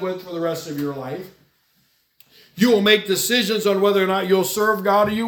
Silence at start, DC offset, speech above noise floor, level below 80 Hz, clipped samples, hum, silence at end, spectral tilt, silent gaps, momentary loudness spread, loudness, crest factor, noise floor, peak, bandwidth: 0 s; under 0.1%; 44 dB; -64 dBFS; under 0.1%; none; 0 s; -4 dB/octave; none; 11 LU; -19 LUFS; 18 dB; -63 dBFS; -2 dBFS; 18 kHz